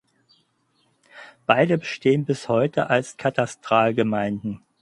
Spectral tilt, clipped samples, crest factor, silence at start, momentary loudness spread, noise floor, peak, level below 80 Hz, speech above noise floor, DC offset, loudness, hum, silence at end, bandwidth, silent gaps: -6 dB/octave; under 0.1%; 24 dB; 1.15 s; 8 LU; -67 dBFS; 0 dBFS; -62 dBFS; 45 dB; under 0.1%; -22 LUFS; none; 0.25 s; 11.5 kHz; none